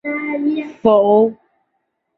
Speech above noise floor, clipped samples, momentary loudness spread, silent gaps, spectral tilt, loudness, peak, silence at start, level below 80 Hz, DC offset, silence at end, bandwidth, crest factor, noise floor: 57 dB; under 0.1%; 9 LU; none; -8.5 dB/octave; -16 LUFS; -2 dBFS; 0.05 s; -58 dBFS; under 0.1%; 0.85 s; 4.4 kHz; 16 dB; -71 dBFS